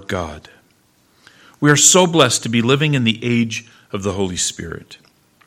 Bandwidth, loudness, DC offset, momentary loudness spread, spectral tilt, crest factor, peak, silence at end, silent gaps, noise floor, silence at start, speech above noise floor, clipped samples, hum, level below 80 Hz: 16.5 kHz; -15 LUFS; under 0.1%; 21 LU; -3.5 dB/octave; 18 dB; 0 dBFS; 0.5 s; none; -57 dBFS; 0 s; 41 dB; under 0.1%; none; -50 dBFS